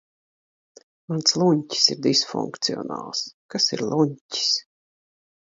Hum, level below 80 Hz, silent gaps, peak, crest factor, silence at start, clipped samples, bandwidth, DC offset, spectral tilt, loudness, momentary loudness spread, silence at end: none; -70 dBFS; 3.34-3.49 s, 4.21-4.29 s; -2 dBFS; 24 dB; 1.1 s; under 0.1%; 7.8 kHz; under 0.1%; -3.5 dB/octave; -22 LUFS; 11 LU; 0.9 s